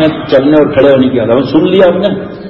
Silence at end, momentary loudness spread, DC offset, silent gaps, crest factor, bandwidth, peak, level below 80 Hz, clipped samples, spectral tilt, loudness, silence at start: 0 s; 4 LU; under 0.1%; none; 8 dB; 5.8 kHz; 0 dBFS; -40 dBFS; 0.3%; -8.5 dB/octave; -8 LUFS; 0 s